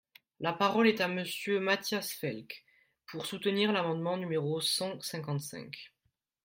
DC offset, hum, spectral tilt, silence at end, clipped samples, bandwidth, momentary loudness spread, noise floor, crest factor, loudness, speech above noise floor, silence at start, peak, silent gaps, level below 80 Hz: under 0.1%; none; -4.5 dB/octave; 0.55 s; under 0.1%; 16.5 kHz; 17 LU; -80 dBFS; 20 dB; -32 LUFS; 48 dB; 0.4 s; -12 dBFS; none; -78 dBFS